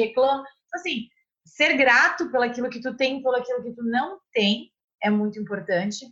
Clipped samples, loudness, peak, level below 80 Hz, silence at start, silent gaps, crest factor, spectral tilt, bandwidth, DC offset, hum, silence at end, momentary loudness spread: under 0.1%; -23 LUFS; -6 dBFS; -68 dBFS; 0 s; 4.84-4.88 s; 18 dB; -4 dB/octave; 8 kHz; under 0.1%; none; 0.05 s; 13 LU